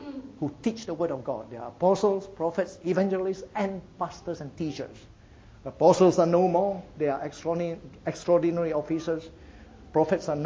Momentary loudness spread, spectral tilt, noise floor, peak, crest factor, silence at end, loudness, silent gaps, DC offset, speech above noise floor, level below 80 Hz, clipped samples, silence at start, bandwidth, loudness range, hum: 14 LU; -7 dB/octave; -51 dBFS; -6 dBFS; 22 dB; 0 s; -27 LUFS; none; under 0.1%; 25 dB; -56 dBFS; under 0.1%; 0 s; 8 kHz; 6 LU; none